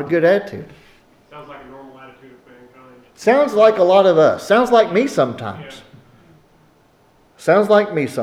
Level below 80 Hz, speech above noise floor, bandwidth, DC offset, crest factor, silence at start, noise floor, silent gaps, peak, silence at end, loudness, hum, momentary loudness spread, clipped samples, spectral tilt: -60 dBFS; 39 dB; 14.5 kHz; under 0.1%; 16 dB; 0 s; -54 dBFS; none; -2 dBFS; 0 s; -15 LUFS; none; 24 LU; under 0.1%; -5.5 dB/octave